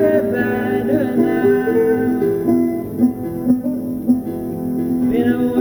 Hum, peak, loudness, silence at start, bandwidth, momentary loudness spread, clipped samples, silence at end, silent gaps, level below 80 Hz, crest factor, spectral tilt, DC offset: none; -2 dBFS; -18 LUFS; 0 s; over 20 kHz; 6 LU; under 0.1%; 0 s; none; -46 dBFS; 14 dB; -8 dB/octave; under 0.1%